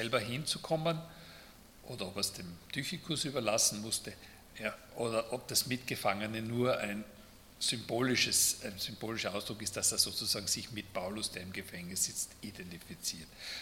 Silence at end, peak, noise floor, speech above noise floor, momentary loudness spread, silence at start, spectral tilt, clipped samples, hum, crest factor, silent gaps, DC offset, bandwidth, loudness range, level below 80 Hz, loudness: 0 s; -12 dBFS; -56 dBFS; 20 dB; 17 LU; 0 s; -2.5 dB/octave; under 0.1%; none; 24 dB; none; under 0.1%; 17.5 kHz; 5 LU; -64 dBFS; -34 LUFS